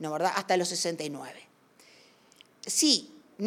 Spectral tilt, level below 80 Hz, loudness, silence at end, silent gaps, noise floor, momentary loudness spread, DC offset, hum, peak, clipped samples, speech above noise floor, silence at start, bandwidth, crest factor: -2 dB/octave; -86 dBFS; -27 LUFS; 0 s; none; -59 dBFS; 19 LU; under 0.1%; none; -6 dBFS; under 0.1%; 30 dB; 0 s; 17 kHz; 24 dB